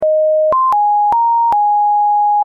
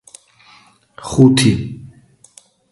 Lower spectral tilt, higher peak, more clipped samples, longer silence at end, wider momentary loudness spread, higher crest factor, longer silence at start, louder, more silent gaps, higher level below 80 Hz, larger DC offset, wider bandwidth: about the same, -6 dB/octave vs -5.5 dB/octave; second, -8 dBFS vs 0 dBFS; neither; second, 0 s vs 0.85 s; second, 0 LU vs 23 LU; second, 4 dB vs 18 dB; second, 0 s vs 1 s; about the same, -12 LUFS vs -13 LUFS; neither; second, -56 dBFS vs -44 dBFS; neither; second, 3.9 kHz vs 11.5 kHz